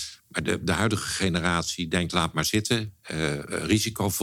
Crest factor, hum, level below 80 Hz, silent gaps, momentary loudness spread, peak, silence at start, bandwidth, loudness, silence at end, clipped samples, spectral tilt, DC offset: 20 dB; none; -48 dBFS; none; 6 LU; -6 dBFS; 0 s; 17.5 kHz; -26 LUFS; 0 s; under 0.1%; -4 dB/octave; under 0.1%